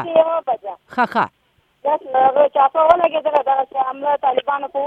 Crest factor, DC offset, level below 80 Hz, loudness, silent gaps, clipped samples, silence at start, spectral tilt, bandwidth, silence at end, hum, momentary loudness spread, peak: 18 dB; under 0.1%; -60 dBFS; -18 LUFS; none; under 0.1%; 0 s; -6 dB/octave; 5.6 kHz; 0 s; none; 10 LU; 0 dBFS